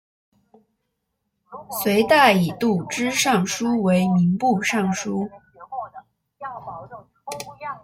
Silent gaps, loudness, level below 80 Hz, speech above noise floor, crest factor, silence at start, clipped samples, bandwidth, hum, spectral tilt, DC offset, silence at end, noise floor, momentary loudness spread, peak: none; -20 LUFS; -60 dBFS; 56 dB; 20 dB; 1.5 s; under 0.1%; 16.5 kHz; none; -5 dB/octave; under 0.1%; 0.05 s; -76 dBFS; 21 LU; -2 dBFS